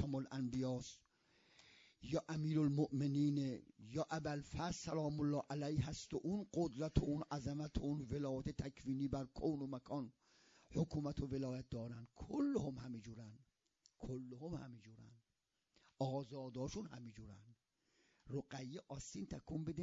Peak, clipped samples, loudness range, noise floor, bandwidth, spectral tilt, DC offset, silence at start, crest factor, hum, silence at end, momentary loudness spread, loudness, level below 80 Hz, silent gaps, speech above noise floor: -20 dBFS; under 0.1%; 9 LU; -89 dBFS; 7.4 kHz; -7.5 dB/octave; under 0.1%; 0 s; 24 dB; none; 0 s; 15 LU; -44 LUFS; -62 dBFS; none; 46 dB